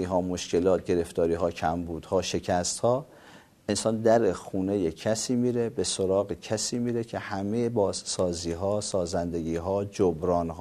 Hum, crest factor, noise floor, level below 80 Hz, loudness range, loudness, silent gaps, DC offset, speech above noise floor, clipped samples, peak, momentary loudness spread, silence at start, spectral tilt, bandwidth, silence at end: none; 18 dB; -53 dBFS; -56 dBFS; 2 LU; -27 LUFS; none; under 0.1%; 26 dB; under 0.1%; -8 dBFS; 6 LU; 0 s; -5 dB/octave; 13.5 kHz; 0 s